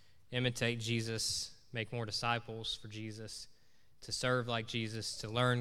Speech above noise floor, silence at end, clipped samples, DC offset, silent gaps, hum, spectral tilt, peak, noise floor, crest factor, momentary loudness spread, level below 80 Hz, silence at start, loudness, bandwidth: 33 dB; 0 s; under 0.1%; 0.1%; none; none; -4 dB/octave; -16 dBFS; -70 dBFS; 22 dB; 12 LU; -64 dBFS; 0.3 s; -37 LUFS; 15 kHz